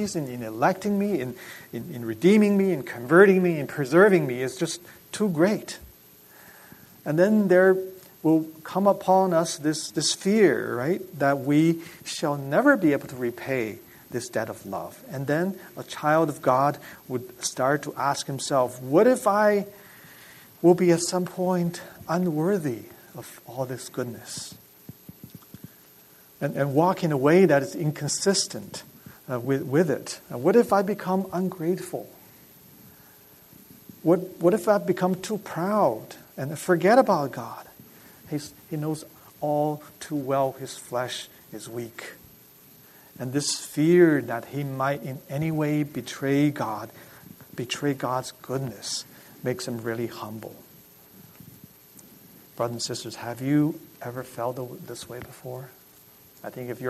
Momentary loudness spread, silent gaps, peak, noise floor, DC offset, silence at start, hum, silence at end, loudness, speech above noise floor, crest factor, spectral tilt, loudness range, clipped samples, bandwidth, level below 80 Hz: 18 LU; none; -4 dBFS; -53 dBFS; under 0.1%; 0 s; none; 0 s; -24 LUFS; 29 dB; 22 dB; -5.5 dB/octave; 10 LU; under 0.1%; 13.5 kHz; -66 dBFS